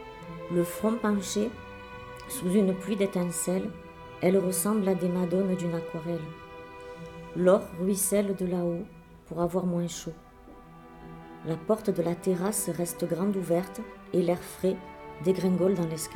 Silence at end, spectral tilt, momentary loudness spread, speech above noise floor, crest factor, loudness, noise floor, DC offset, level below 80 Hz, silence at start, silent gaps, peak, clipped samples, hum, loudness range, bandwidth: 0 s; -6 dB/octave; 18 LU; 22 dB; 18 dB; -28 LUFS; -50 dBFS; under 0.1%; -56 dBFS; 0 s; none; -10 dBFS; under 0.1%; none; 4 LU; 18 kHz